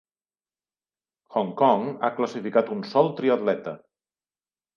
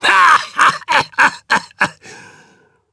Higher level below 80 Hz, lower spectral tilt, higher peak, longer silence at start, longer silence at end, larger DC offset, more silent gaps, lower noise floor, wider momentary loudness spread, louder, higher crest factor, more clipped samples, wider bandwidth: second, -80 dBFS vs -58 dBFS; first, -7 dB/octave vs -1.5 dB/octave; second, -4 dBFS vs 0 dBFS; first, 1.3 s vs 0 s; first, 1 s vs 0.8 s; neither; neither; first, under -90 dBFS vs -52 dBFS; about the same, 9 LU vs 10 LU; second, -24 LUFS vs -13 LUFS; first, 22 dB vs 16 dB; neither; second, 7.2 kHz vs 11 kHz